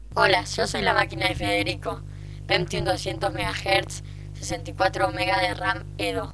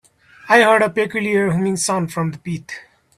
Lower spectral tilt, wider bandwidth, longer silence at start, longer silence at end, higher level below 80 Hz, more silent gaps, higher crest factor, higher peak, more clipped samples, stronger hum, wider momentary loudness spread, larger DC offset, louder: about the same, -4 dB/octave vs -4.5 dB/octave; second, 11 kHz vs 14 kHz; second, 0 s vs 0.45 s; second, 0 s vs 0.35 s; first, -42 dBFS vs -58 dBFS; neither; about the same, 22 dB vs 18 dB; second, -4 dBFS vs 0 dBFS; neither; first, 50 Hz at -60 dBFS vs none; second, 13 LU vs 16 LU; neither; second, -24 LUFS vs -17 LUFS